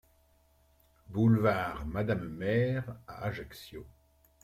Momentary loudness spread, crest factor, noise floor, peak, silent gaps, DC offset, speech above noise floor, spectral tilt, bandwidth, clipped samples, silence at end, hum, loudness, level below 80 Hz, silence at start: 19 LU; 18 dB; -67 dBFS; -14 dBFS; none; under 0.1%; 36 dB; -8 dB/octave; 14.5 kHz; under 0.1%; 0.55 s; none; -31 LUFS; -54 dBFS; 1.1 s